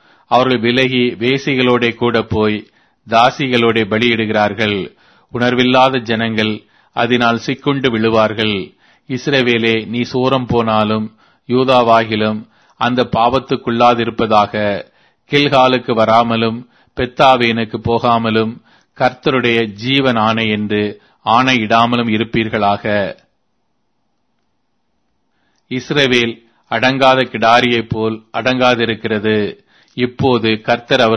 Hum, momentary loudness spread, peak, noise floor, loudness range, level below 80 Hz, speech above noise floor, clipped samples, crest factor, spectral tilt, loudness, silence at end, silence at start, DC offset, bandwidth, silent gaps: none; 9 LU; 0 dBFS; -68 dBFS; 3 LU; -48 dBFS; 54 dB; under 0.1%; 14 dB; -6 dB/octave; -14 LUFS; 0 s; 0.3 s; under 0.1%; 9.2 kHz; none